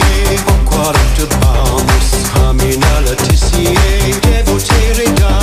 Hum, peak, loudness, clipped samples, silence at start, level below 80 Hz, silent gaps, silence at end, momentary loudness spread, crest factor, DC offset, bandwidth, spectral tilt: none; 0 dBFS; -11 LUFS; under 0.1%; 0 s; -12 dBFS; none; 0 s; 1 LU; 10 dB; under 0.1%; 15.5 kHz; -4.5 dB/octave